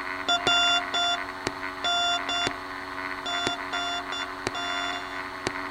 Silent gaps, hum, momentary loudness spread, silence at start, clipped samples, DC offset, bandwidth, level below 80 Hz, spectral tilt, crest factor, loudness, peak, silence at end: none; none; 11 LU; 0 s; under 0.1%; under 0.1%; 16.5 kHz; -56 dBFS; -1.5 dB/octave; 26 dB; -27 LUFS; -2 dBFS; 0 s